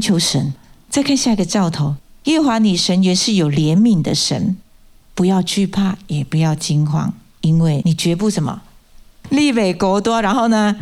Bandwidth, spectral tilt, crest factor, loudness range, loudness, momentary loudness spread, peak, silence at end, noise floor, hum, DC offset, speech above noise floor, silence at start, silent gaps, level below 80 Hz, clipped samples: 14 kHz; -5 dB/octave; 12 dB; 3 LU; -16 LUFS; 8 LU; -4 dBFS; 0 s; -46 dBFS; none; under 0.1%; 30 dB; 0 s; none; -44 dBFS; under 0.1%